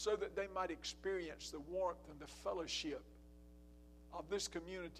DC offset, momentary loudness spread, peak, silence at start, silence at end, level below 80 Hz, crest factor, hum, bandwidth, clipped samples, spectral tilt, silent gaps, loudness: under 0.1%; 21 LU; -26 dBFS; 0 s; 0 s; -62 dBFS; 18 dB; none; 15 kHz; under 0.1%; -3 dB/octave; none; -44 LUFS